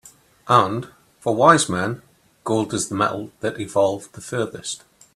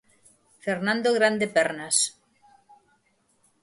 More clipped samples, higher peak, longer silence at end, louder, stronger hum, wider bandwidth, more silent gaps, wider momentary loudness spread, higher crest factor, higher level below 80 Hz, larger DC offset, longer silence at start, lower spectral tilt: neither; first, 0 dBFS vs -8 dBFS; second, 0.4 s vs 1.5 s; first, -21 LUFS vs -24 LUFS; neither; first, 14 kHz vs 11.5 kHz; neither; first, 16 LU vs 7 LU; about the same, 22 dB vs 20 dB; first, -60 dBFS vs -72 dBFS; neither; second, 0.45 s vs 0.65 s; first, -4.5 dB/octave vs -2.5 dB/octave